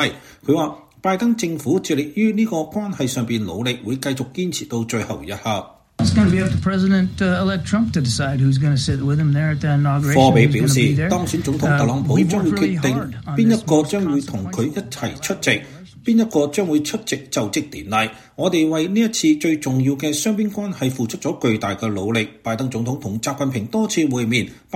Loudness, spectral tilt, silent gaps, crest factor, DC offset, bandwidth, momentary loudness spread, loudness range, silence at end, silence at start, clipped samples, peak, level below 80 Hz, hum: -19 LUFS; -5.5 dB/octave; none; 18 dB; under 0.1%; 16 kHz; 8 LU; 5 LU; 0 s; 0 s; under 0.1%; 0 dBFS; -46 dBFS; none